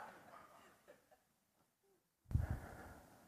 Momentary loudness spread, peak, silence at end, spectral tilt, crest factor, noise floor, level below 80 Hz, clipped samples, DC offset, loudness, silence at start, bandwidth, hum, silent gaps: 25 LU; -24 dBFS; 0 s; -7.5 dB/octave; 26 dB; -81 dBFS; -56 dBFS; under 0.1%; under 0.1%; -46 LUFS; 0 s; 15 kHz; none; none